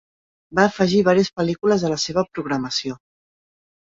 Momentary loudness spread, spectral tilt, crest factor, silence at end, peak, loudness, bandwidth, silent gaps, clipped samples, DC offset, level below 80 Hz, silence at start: 9 LU; -5 dB/octave; 18 dB; 1 s; -2 dBFS; -20 LUFS; 7.8 kHz; none; under 0.1%; under 0.1%; -56 dBFS; 0.5 s